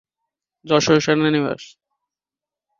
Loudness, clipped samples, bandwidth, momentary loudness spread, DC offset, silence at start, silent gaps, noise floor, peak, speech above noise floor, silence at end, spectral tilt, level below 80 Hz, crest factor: -18 LUFS; under 0.1%; 7.4 kHz; 10 LU; under 0.1%; 0.65 s; none; -89 dBFS; -2 dBFS; 71 dB; 1.15 s; -5 dB/octave; -58 dBFS; 20 dB